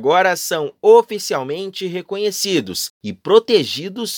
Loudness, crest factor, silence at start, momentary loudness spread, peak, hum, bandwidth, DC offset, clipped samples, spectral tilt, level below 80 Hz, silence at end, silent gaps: -17 LUFS; 16 dB; 0 s; 13 LU; 0 dBFS; none; 19 kHz; under 0.1%; under 0.1%; -3 dB/octave; -66 dBFS; 0 s; 2.90-3.01 s